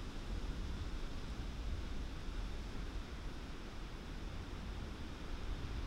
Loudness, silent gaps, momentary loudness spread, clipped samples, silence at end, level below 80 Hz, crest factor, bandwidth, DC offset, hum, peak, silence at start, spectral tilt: -47 LUFS; none; 4 LU; under 0.1%; 0 s; -44 dBFS; 14 dB; 13.5 kHz; under 0.1%; none; -30 dBFS; 0 s; -5.5 dB/octave